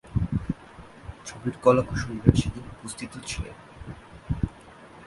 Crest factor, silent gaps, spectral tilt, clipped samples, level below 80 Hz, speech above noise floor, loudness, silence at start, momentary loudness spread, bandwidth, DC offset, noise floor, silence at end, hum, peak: 28 dB; none; -6.5 dB/octave; under 0.1%; -40 dBFS; 23 dB; -27 LUFS; 0.05 s; 23 LU; 11.5 kHz; under 0.1%; -48 dBFS; 0 s; none; 0 dBFS